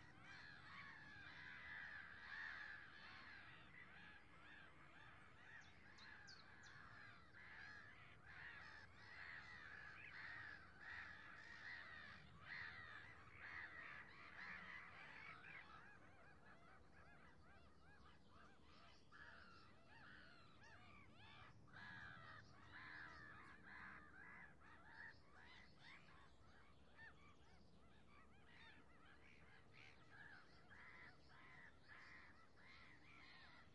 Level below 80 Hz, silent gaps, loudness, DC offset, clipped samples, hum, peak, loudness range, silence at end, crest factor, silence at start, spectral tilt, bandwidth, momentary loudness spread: -80 dBFS; none; -61 LUFS; under 0.1%; under 0.1%; none; -44 dBFS; 11 LU; 0 s; 18 dB; 0 s; -4 dB/octave; 8.4 kHz; 13 LU